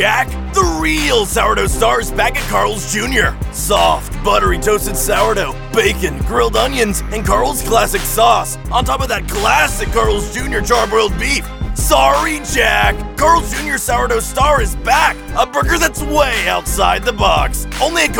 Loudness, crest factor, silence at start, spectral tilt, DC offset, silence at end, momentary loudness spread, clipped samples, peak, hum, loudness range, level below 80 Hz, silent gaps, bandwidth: -14 LUFS; 14 dB; 0 s; -3.5 dB/octave; 0.3%; 0 s; 5 LU; under 0.1%; 0 dBFS; none; 1 LU; -22 dBFS; none; 20 kHz